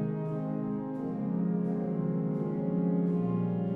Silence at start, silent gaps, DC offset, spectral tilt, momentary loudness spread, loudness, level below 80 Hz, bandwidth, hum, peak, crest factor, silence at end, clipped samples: 0 s; none; under 0.1%; -12 dB/octave; 5 LU; -31 LUFS; -64 dBFS; 3.1 kHz; none; -20 dBFS; 12 dB; 0 s; under 0.1%